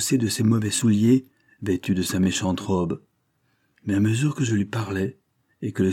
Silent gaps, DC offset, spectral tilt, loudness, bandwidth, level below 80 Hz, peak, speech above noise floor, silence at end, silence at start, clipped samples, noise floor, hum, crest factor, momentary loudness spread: none; under 0.1%; -5.5 dB/octave; -23 LUFS; 17 kHz; -58 dBFS; -8 dBFS; 47 dB; 0 s; 0 s; under 0.1%; -69 dBFS; none; 16 dB; 11 LU